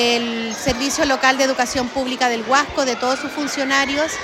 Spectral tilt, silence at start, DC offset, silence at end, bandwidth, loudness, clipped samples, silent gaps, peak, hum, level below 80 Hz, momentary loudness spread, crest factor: -2 dB/octave; 0 s; under 0.1%; 0 s; 16.5 kHz; -18 LUFS; under 0.1%; none; -4 dBFS; none; -46 dBFS; 6 LU; 16 dB